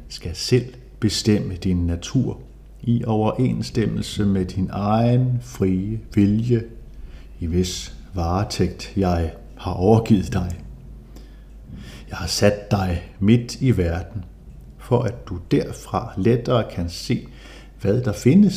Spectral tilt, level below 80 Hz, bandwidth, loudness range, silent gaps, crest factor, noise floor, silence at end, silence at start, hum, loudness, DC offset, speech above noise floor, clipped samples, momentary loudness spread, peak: -6.5 dB/octave; -38 dBFS; 15 kHz; 2 LU; none; 20 dB; -41 dBFS; 0 s; 0 s; none; -22 LUFS; under 0.1%; 20 dB; under 0.1%; 18 LU; -2 dBFS